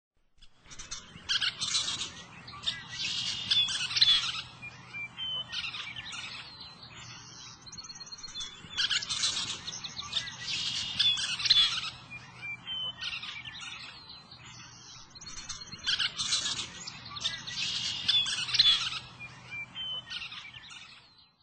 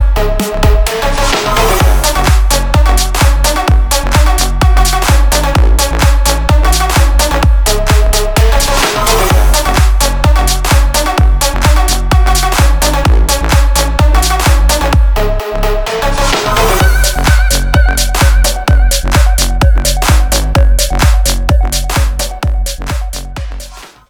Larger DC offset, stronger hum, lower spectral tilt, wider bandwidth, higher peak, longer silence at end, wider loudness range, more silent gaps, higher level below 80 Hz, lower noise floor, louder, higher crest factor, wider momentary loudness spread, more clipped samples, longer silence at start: neither; neither; second, 0.5 dB/octave vs -4 dB/octave; second, 9 kHz vs 19.5 kHz; second, -10 dBFS vs 0 dBFS; about the same, 0.2 s vs 0.25 s; first, 11 LU vs 1 LU; neither; second, -62 dBFS vs -10 dBFS; first, -57 dBFS vs -29 dBFS; second, -29 LUFS vs -11 LUFS; first, 24 dB vs 8 dB; first, 22 LU vs 5 LU; second, under 0.1% vs 0.1%; first, 0.4 s vs 0 s